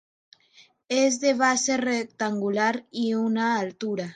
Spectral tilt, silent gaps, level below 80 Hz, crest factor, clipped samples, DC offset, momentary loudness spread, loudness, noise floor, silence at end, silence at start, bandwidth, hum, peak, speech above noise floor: -3.5 dB/octave; none; -74 dBFS; 18 dB; under 0.1%; under 0.1%; 7 LU; -24 LUFS; -58 dBFS; 0 s; 0.9 s; 9.6 kHz; none; -8 dBFS; 33 dB